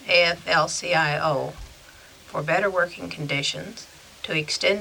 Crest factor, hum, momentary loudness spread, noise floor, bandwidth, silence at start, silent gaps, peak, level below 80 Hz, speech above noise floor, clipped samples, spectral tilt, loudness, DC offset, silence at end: 20 dB; none; 17 LU; -48 dBFS; over 20 kHz; 0 s; none; -6 dBFS; -54 dBFS; 24 dB; under 0.1%; -3 dB/octave; -23 LUFS; under 0.1%; 0 s